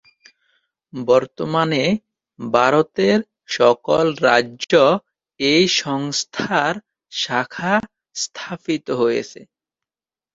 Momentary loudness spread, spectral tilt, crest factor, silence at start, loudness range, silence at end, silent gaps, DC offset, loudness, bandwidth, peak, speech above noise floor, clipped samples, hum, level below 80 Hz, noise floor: 12 LU; -4 dB/octave; 20 dB; 0.95 s; 6 LU; 0.9 s; none; under 0.1%; -19 LUFS; 7.8 kHz; 0 dBFS; over 72 dB; under 0.1%; none; -60 dBFS; under -90 dBFS